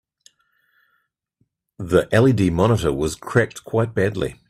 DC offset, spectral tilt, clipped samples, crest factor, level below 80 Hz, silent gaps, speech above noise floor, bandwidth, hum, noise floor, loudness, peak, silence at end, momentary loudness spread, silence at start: under 0.1%; -6.5 dB/octave; under 0.1%; 18 dB; -44 dBFS; none; 51 dB; 14 kHz; none; -70 dBFS; -19 LUFS; -2 dBFS; 0.15 s; 7 LU; 1.8 s